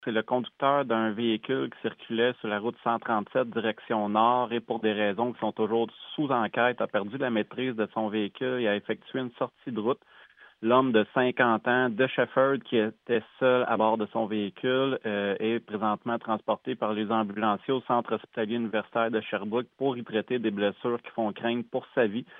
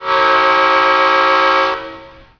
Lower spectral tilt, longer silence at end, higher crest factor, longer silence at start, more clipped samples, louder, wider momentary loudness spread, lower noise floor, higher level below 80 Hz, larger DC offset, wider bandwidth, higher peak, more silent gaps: first, -9 dB/octave vs -3 dB/octave; second, 0 s vs 0.3 s; first, 20 dB vs 12 dB; about the same, 0 s vs 0 s; neither; second, -28 LUFS vs -11 LUFS; about the same, 7 LU vs 9 LU; first, -55 dBFS vs -36 dBFS; second, -82 dBFS vs -50 dBFS; neither; second, 3.9 kHz vs 5.4 kHz; second, -8 dBFS vs 0 dBFS; neither